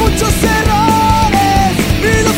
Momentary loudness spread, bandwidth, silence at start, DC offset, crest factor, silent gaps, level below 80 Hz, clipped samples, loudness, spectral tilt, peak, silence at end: 2 LU; 16.5 kHz; 0 s; under 0.1%; 10 dB; none; -20 dBFS; under 0.1%; -11 LUFS; -4.5 dB/octave; 0 dBFS; 0 s